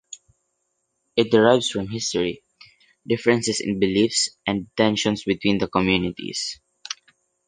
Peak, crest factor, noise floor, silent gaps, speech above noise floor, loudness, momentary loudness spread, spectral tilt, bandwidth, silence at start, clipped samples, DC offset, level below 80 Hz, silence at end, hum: -2 dBFS; 22 dB; -74 dBFS; none; 53 dB; -22 LUFS; 17 LU; -4 dB/octave; 10 kHz; 0.1 s; under 0.1%; under 0.1%; -52 dBFS; 0.55 s; none